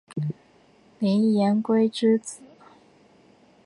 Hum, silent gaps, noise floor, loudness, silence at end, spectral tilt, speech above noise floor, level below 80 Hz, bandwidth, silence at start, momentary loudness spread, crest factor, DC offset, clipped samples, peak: none; none; -57 dBFS; -23 LUFS; 1.3 s; -6.5 dB/octave; 36 dB; -74 dBFS; 11 kHz; 0.15 s; 18 LU; 16 dB; under 0.1%; under 0.1%; -10 dBFS